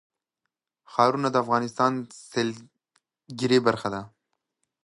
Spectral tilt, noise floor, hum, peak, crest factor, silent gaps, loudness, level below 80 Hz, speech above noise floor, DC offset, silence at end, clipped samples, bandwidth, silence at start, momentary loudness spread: -5.5 dB/octave; -84 dBFS; none; -4 dBFS; 22 dB; none; -25 LUFS; -68 dBFS; 60 dB; under 0.1%; 0.8 s; under 0.1%; 11.5 kHz; 0.9 s; 13 LU